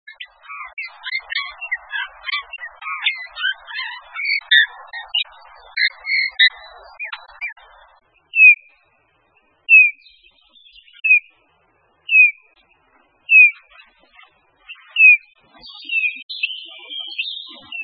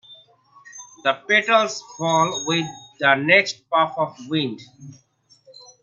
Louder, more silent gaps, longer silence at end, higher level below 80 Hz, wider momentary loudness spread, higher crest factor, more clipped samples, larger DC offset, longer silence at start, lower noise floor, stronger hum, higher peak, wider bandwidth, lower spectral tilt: first, -14 LUFS vs -20 LUFS; first, 16.23-16.29 s vs none; second, 0 s vs 0.9 s; first, -66 dBFS vs -72 dBFS; first, 22 LU vs 13 LU; about the same, 20 dB vs 22 dB; neither; neither; about the same, 0.1 s vs 0.1 s; first, -61 dBFS vs -54 dBFS; neither; about the same, 0 dBFS vs 0 dBFS; second, 5 kHz vs 7.6 kHz; second, 0 dB/octave vs -3.5 dB/octave